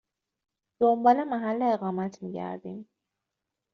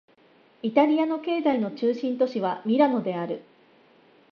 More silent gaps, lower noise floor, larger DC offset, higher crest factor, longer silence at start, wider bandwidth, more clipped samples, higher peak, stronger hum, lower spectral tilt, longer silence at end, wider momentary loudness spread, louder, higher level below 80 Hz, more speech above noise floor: neither; first, -86 dBFS vs -58 dBFS; neither; about the same, 20 dB vs 20 dB; first, 0.8 s vs 0.65 s; about the same, 6.8 kHz vs 6.6 kHz; neither; about the same, -8 dBFS vs -6 dBFS; neither; second, -6.5 dB/octave vs -8 dB/octave; about the same, 0.9 s vs 0.9 s; first, 16 LU vs 10 LU; about the same, -27 LUFS vs -25 LUFS; about the same, -74 dBFS vs -78 dBFS; first, 60 dB vs 34 dB